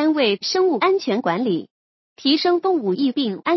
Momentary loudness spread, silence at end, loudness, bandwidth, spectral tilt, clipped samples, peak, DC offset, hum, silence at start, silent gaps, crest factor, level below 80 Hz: 5 LU; 0 s; -20 LUFS; 6.2 kHz; -5 dB/octave; under 0.1%; -4 dBFS; under 0.1%; none; 0 s; 1.71-2.16 s; 14 dB; -78 dBFS